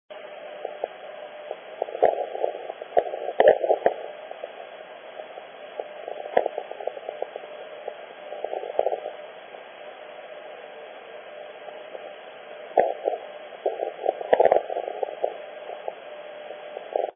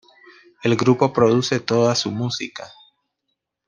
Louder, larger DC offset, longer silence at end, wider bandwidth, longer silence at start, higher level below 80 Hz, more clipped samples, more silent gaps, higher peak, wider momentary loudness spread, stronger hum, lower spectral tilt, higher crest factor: second, -27 LUFS vs -19 LUFS; neither; second, 0.05 s vs 1 s; second, 3.6 kHz vs 10 kHz; second, 0.1 s vs 0.65 s; second, -70 dBFS vs -62 dBFS; neither; neither; about the same, -4 dBFS vs -2 dBFS; first, 18 LU vs 14 LU; neither; second, 2 dB/octave vs -5.5 dB/octave; about the same, 24 dB vs 20 dB